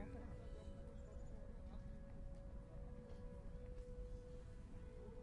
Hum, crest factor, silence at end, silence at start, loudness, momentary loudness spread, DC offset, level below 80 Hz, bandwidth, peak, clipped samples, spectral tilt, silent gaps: none; 16 dB; 0 s; 0 s; -57 LUFS; 2 LU; under 0.1%; -54 dBFS; 11 kHz; -38 dBFS; under 0.1%; -8 dB/octave; none